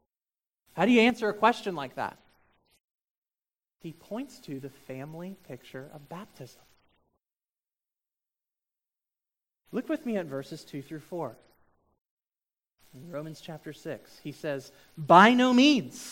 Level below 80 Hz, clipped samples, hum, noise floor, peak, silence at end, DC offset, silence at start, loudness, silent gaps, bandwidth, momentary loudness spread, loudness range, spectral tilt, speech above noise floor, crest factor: -74 dBFS; under 0.1%; none; under -90 dBFS; -4 dBFS; 0 s; under 0.1%; 0.75 s; -25 LUFS; 2.84-2.95 s, 3.01-3.22 s, 12.10-12.17 s; 16.5 kHz; 24 LU; 20 LU; -5 dB/octave; over 62 dB; 26 dB